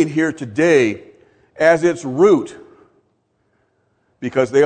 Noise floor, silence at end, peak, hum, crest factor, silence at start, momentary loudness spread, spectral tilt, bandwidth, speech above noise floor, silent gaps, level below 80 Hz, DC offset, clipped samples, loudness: -65 dBFS; 0 s; 0 dBFS; none; 18 dB; 0 s; 12 LU; -6 dB/octave; 9.4 kHz; 50 dB; none; -62 dBFS; under 0.1%; under 0.1%; -16 LUFS